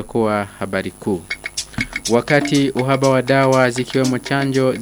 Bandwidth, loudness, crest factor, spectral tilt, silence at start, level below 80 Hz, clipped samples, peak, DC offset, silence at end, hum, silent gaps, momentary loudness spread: over 20 kHz; -18 LUFS; 18 dB; -5 dB/octave; 0 s; -46 dBFS; under 0.1%; 0 dBFS; under 0.1%; 0 s; none; none; 9 LU